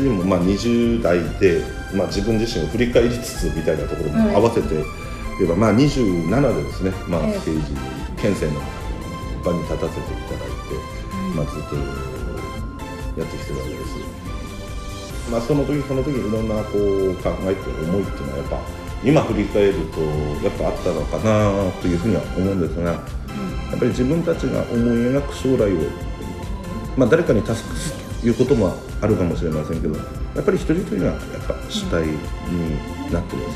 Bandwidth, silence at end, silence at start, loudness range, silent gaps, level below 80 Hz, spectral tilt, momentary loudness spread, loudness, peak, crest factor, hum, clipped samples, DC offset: 15 kHz; 0 s; 0 s; 7 LU; none; -32 dBFS; -6.5 dB/octave; 12 LU; -21 LUFS; -2 dBFS; 18 dB; none; under 0.1%; under 0.1%